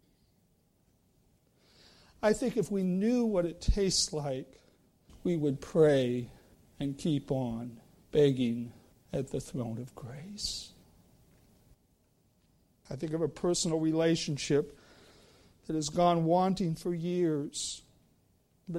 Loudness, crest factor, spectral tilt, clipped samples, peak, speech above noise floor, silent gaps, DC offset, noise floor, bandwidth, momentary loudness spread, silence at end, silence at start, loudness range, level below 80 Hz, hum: -31 LUFS; 20 dB; -5.5 dB/octave; under 0.1%; -14 dBFS; 40 dB; none; under 0.1%; -70 dBFS; 16 kHz; 15 LU; 0 s; 2.2 s; 10 LU; -48 dBFS; none